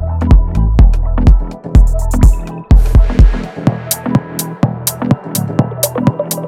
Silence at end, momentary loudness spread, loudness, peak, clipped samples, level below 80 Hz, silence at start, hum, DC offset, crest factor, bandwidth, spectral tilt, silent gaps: 0 s; 6 LU; -13 LUFS; 0 dBFS; 4%; -12 dBFS; 0 s; none; under 0.1%; 10 dB; 16.5 kHz; -6 dB/octave; none